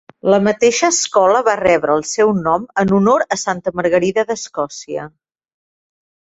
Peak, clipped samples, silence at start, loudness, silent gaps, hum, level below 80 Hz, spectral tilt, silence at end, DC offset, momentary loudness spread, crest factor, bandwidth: -2 dBFS; under 0.1%; 0.25 s; -15 LUFS; none; none; -52 dBFS; -4 dB/octave; 1.25 s; under 0.1%; 11 LU; 16 dB; 8.2 kHz